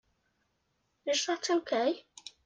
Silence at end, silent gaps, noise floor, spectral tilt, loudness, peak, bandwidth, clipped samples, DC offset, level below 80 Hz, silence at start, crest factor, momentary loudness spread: 0.15 s; none; -78 dBFS; -1 dB/octave; -31 LUFS; -18 dBFS; 9.6 kHz; under 0.1%; under 0.1%; -80 dBFS; 1.05 s; 16 dB; 12 LU